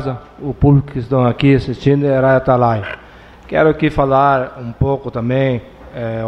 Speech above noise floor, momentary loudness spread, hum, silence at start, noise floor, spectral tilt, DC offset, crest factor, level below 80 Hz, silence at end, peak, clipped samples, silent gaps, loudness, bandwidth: 25 dB; 13 LU; none; 0 s; -39 dBFS; -9 dB/octave; under 0.1%; 14 dB; -34 dBFS; 0 s; 0 dBFS; under 0.1%; none; -15 LUFS; 6 kHz